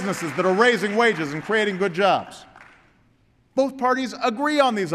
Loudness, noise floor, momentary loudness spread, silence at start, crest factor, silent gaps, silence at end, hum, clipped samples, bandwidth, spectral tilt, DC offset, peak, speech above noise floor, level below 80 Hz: -21 LUFS; -60 dBFS; 7 LU; 0 s; 16 dB; none; 0 s; none; under 0.1%; 14 kHz; -4.5 dB/octave; under 0.1%; -6 dBFS; 39 dB; -66 dBFS